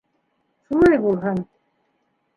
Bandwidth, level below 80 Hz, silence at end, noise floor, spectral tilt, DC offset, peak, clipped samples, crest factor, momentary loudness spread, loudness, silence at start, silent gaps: 10.5 kHz; -48 dBFS; 0.95 s; -69 dBFS; -8.5 dB/octave; under 0.1%; -4 dBFS; under 0.1%; 18 dB; 13 LU; -19 LUFS; 0.7 s; none